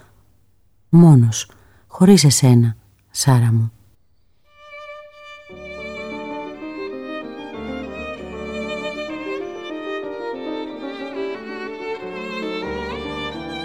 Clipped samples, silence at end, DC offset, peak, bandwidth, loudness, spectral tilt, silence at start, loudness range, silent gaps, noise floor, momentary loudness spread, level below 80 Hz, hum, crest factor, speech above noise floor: under 0.1%; 0 s; 0.2%; -2 dBFS; 15 kHz; -19 LUFS; -5.5 dB/octave; 0.9 s; 17 LU; none; -62 dBFS; 22 LU; -50 dBFS; none; 18 dB; 50 dB